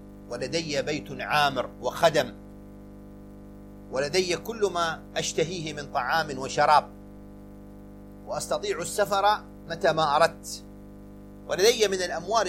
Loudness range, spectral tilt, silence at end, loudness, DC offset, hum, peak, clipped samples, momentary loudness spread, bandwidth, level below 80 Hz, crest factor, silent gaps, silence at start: 4 LU; -3 dB/octave; 0 s; -26 LUFS; under 0.1%; 50 Hz at -45 dBFS; -6 dBFS; under 0.1%; 24 LU; 16.5 kHz; -52 dBFS; 22 dB; none; 0 s